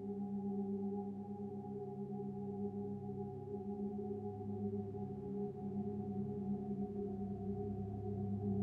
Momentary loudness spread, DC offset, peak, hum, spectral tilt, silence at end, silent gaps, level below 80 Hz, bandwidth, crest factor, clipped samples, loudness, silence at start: 5 LU; under 0.1%; -28 dBFS; none; -12 dB/octave; 0 s; none; -64 dBFS; 2.5 kHz; 14 dB; under 0.1%; -44 LUFS; 0 s